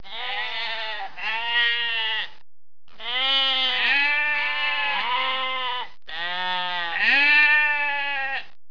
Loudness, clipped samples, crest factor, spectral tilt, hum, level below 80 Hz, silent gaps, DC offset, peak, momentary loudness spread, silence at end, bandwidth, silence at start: -21 LUFS; under 0.1%; 16 dB; -1.5 dB/octave; none; -66 dBFS; none; 2%; -8 dBFS; 13 LU; 0.25 s; 5.4 kHz; 0.05 s